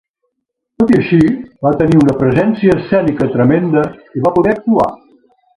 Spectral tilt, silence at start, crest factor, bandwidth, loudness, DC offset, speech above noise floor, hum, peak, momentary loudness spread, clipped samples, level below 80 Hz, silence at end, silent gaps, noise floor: -9 dB/octave; 0.8 s; 12 dB; 11 kHz; -13 LUFS; under 0.1%; 62 dB; none; 0 dBFS; 6 LU; under 0.1%; -42 dBFS; 0.6 s; none; -73 dBFS